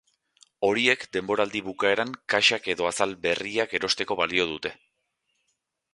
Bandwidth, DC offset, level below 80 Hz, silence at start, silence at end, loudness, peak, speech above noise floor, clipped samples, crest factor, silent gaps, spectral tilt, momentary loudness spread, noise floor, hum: 11.5 kHz; under 0.1%; -62 dBFS; 0.6 s; 1.2 s; -25 LUFS; -6 dBFS; 52 dB; under 0.1%; 22 dB; none; -2.5 dB/octave; 7 LU; -77 dBFS; none